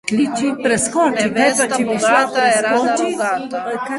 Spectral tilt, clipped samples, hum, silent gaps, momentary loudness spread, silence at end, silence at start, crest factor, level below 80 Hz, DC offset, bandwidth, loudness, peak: -3 dB/octave; under 0.1%; none; none; 6 LU; 0 s; 0.05 s; 16 dB; -56 dBFS; under 0.1%; 12 kHz; -16 LUFS; -2 dBFS